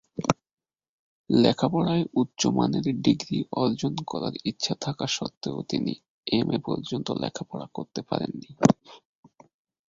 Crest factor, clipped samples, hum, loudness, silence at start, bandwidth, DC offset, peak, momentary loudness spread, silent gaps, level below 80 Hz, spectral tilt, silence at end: 26 dB; under 0.1%; none; -27 LUFS; 0.15 s; 7.8 kHz; under 0.1%; -2 dBFS; 10 LU; 0.53-0.57 s, 0.89-1.24 s, 5.37-5.41 s, 6.09-6.23 s; -60 dBFS; -5.5 dB/octave; 0.9 s